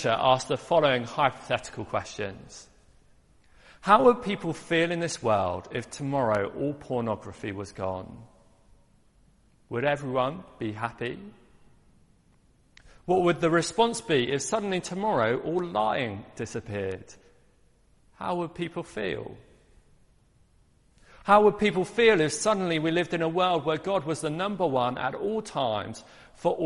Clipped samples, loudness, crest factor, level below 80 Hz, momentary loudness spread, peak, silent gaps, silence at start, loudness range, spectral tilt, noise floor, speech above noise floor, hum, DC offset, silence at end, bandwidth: under 0.1%; -27 LUFS; 24 dB; -60 dBFS; 14 LU; -4 dBFS; none; 0 s; 11 LU; -5 dB/octave; -62 dBFS; 35 dB; none; under 0.1%; 0 s; 11.5 kHz